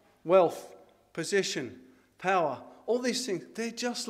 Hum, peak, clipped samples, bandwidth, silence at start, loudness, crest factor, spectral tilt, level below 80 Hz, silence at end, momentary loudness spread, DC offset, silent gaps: none; -8 dBFS; under 0.1%; 15.5 kHz; 0.25 s; -29 LUFS; 22 dB; -3.5 dB/octave; -78 dBFS; 0 s; 16 LU; under 0.1%; none